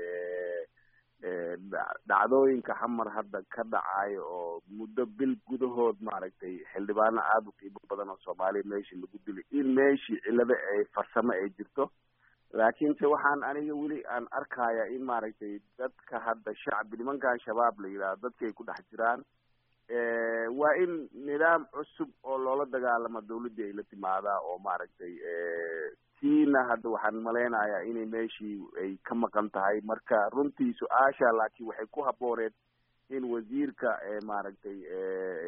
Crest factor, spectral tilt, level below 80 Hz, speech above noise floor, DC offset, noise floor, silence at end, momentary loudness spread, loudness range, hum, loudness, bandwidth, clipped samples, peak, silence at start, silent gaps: 20 dB; -4 dB/octave; -76 dBFS; 37 dB; under 0.1%; -68 dBFS; 0 s; 14 LU; 4 LU; none; -31 LUFS; 4.8 kHz; under 0.1%; -10 dBFS; 0 s; none